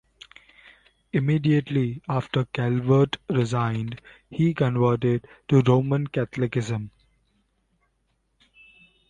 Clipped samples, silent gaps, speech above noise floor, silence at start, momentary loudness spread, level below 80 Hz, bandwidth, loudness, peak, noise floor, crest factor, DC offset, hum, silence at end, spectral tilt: under 0.1%; none; 48 dB; 1.15 s; 10 LU; -56 dBFS; 9 kHz; -24 LUFS; -6 dBFS; -71 dBFS; 20 dB; under 0.1%; none; 2.2 s; -8 dB/octave